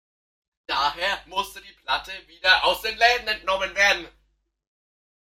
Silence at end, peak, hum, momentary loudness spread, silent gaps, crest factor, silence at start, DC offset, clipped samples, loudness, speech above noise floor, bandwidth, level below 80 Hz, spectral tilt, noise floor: 1.2 s; -4 dBFS; none; 11 LU; none; 22 dB; 0.7 s; under 0.1%; under 0.1%; -22 LUFS; 47 dB; 16 kHz; -52 dBFS; -0.5 dB/octave; -69 dBFS